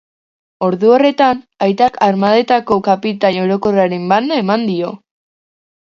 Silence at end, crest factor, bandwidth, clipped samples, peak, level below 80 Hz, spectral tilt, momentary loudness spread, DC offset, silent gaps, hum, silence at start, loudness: 1 s; 14 dB; 7.4 kHz; under 0.1%; 0 dBFS; -54 dBFS; -7 dB/octave; 7 LU; under 0.1%; none; none; 0.6 s; -14 LUFS